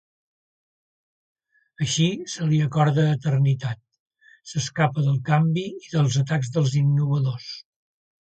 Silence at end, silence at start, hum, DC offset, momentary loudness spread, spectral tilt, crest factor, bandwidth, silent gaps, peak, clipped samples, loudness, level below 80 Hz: 0.65 s; 1.8 s; none; under 0.1%; 10 LU; -6 dB/octave; 18 dB; 8.8 kHz; 4.00-4.06 s; -6 dBFS; under 0.1%; -23 LUFS; -60 dBFS